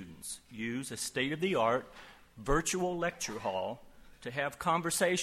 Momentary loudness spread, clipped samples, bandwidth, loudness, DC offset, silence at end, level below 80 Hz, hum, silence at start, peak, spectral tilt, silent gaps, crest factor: 15 LU; under 0.1%; 16 kHz; -34 LUFS; under 0.1%; 0 s; -50 dBFS; none; 0 s; -16 dBFS; -3.5 dB/octave; none; 18 dB